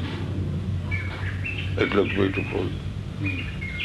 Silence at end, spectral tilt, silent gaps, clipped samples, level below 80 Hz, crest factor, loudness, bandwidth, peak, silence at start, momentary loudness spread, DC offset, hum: 0 s; -7 dB/octave; none; under 0.1%; -40 dBFS; 22 dB; -27 LUFS; 10 kHz; -6 dBFS; 0 s; 8 LU; under 0.1%; none